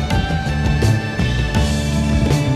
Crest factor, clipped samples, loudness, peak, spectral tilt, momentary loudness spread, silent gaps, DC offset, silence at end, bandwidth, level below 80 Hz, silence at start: 12 dB; under 0.1%; -18 LUFS; -4 dBFS; -6 dB/octave; 3 LU; none; under 0.1%; 0 s; 15 kHz; -22 dBFS; 0 s